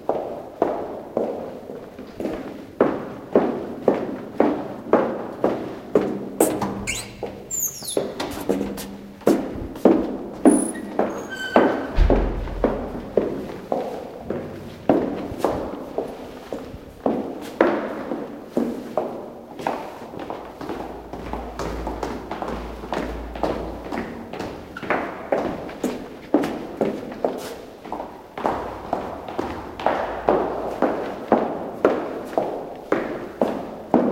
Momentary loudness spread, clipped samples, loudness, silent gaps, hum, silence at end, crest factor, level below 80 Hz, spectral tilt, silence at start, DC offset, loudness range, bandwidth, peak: 12 LU; under 0.1%; -25 LUFS; none; none; 0 s; 24 dB; -38 dBFS; -5 dB/octave; 0 s; under 0.1%; 8 LU; 16.5 kHz; 0 dBFS